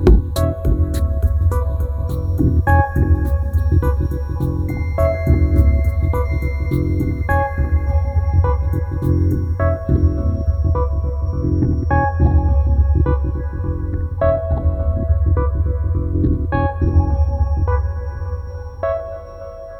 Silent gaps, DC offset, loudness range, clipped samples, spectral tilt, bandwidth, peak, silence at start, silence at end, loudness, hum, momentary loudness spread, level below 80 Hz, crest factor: none; under 0.1%; 2 LU; under 0.1%; -9 dB/octave; 12.5 kHz; 0 dBFS; 0 s; 0 s; -18 LUFS; none; 7 LU; -20 dBFS; 16 dB